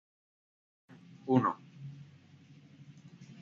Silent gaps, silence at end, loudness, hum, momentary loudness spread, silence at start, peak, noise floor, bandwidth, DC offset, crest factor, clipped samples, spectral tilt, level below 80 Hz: none; 0.1 s; -32 LUFS; none; 27 LU; 1.25 s; -14 dBFS; -58 dBFS; 7 kHz; under 0.1%; 24 dB; under 0.1%; -7.5 dB/octave; -80 dBFS